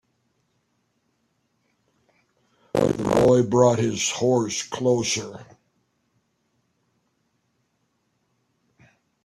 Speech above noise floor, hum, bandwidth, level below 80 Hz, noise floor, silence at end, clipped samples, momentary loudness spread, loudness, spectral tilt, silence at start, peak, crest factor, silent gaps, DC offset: 51 dB; none; 13.5 kHz; -56 dBFS; -72 dBFS; 3.8 s; under 0.1%; 10 LU; -21 LUFS; -5 dB/octave; 2.75 s; -4 dBFS; 22 dB; none; under 0.1%